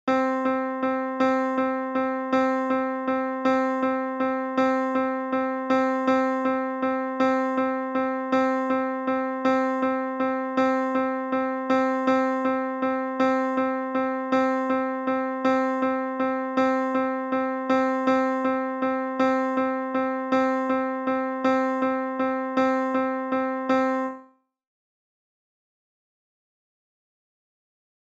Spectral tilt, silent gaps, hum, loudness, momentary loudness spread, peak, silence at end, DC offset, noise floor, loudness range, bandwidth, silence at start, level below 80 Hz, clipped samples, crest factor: -5.5 dB/octave; none; none; -25 LUFS; 4 LU; -10 dBFS; 3.8 s; under 0.1%; -54 dBFS; 1 LU; 7.6 kHz; 0.05 s; -70 dBFS; under 0.1%; 14 dB